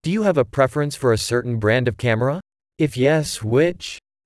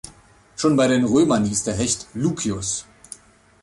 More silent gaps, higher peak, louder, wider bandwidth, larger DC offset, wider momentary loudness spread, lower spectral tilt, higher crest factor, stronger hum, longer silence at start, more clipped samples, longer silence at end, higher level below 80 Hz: neither; about the same, -4 dBFS vs -6 dBFS; about the same, -20 LUFS vs -20 LUFS; about the same, 12 kHz vs 11.5 kHz; neither; second, 6 LU vs 23 LU; about the same, -5.5 dB/octave vs -4.5 dB/octave; about the same, 16 dB vs 16 dB; neither; second, 0.05 s vs 0.6 s; neither; second, 0.25 s vs 0.8 s; about the same, -50 dBFS vs -48 dBFS